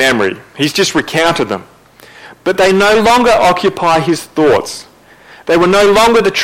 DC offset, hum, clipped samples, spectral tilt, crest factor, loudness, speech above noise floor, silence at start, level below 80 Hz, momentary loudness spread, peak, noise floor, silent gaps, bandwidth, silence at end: under 0.1%; none; under 0.1%; -4 dB/octave; 10 dB; -11 LUFS; 30 dB; 0 s; -40 dBFS; 11 LU; -2 dBFS; -40 dBFS; none; 16.5 kHz; 0 s